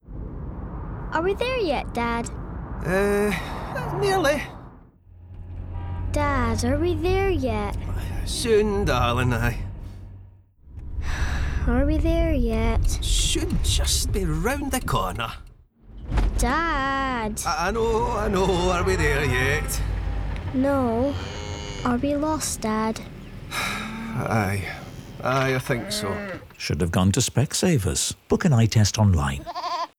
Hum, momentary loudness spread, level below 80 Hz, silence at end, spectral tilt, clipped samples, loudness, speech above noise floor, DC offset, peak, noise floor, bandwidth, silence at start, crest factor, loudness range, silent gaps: none; 14 LU; -30 dBFS; 0.1 s; -5 dB/octave; under 0.1%; -24 LUFS; 26 dB; under 0.1%; -10 dBFS; -48 dBFS; 17.5 kHz; 0.05 s; 14 dB; 4 LU; none